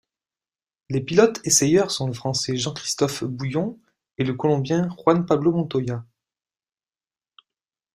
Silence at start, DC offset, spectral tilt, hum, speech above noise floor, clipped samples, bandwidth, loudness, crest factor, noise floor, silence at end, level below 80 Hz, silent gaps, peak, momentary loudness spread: 0.9 s; under 0.1%; -4.5 dB/octave; none; over 69 dB; under 0.1%; 15.5 kHz; -22 LUFS; 20 dB; under -90 dBFS; 1.9 s; -60 dBFS; none; -2 dBFS; 10 LU